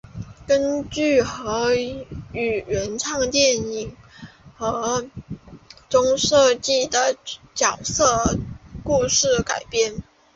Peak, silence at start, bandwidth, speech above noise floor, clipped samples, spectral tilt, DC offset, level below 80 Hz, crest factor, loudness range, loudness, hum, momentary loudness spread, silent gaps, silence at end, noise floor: -4 dBFS; 0.05 s; 8 kHz; 24 dB; under 0.1%; -3 dB/octave; under 0.1%; -44 dBFS; 18 dB; 4 LU; -21 LUFS; none; 17 LU; none; 0.35 s; -45 dBFS